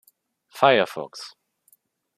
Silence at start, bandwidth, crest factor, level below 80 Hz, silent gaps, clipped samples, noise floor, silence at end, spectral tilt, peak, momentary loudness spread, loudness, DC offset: 0.55 s; 15 kHz; 24 dB; -72 dBFS; none; under 0.1%; -63 dBFS; 0.9 s; -4.5 dB/octave; -2 dBFS; 21 LU; -21 LUFS; under 0.1%